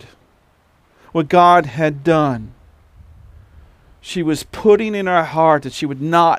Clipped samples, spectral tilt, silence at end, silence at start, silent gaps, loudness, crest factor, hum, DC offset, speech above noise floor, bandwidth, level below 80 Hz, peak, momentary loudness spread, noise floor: under 0.1%; -6 dB/octave; 0 s; 1.15 s; none; -16 LUFS; 16 dB; none; under 0.1%; 41 dB; 15.5 kHz; -48 dBFS; 0 dBFS; 12 LU; -56 dBFS